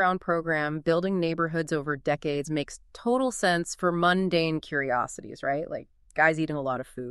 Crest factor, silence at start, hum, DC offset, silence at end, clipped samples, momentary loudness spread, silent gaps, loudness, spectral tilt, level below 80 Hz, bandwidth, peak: 18 dB; 0 s; none; under 0.1%; 0 s; under 0.1%; 10 LU; none; -27 LUFS; -5 dB/octave; -56 dBFS; 12.5 kHz; -8 dBFS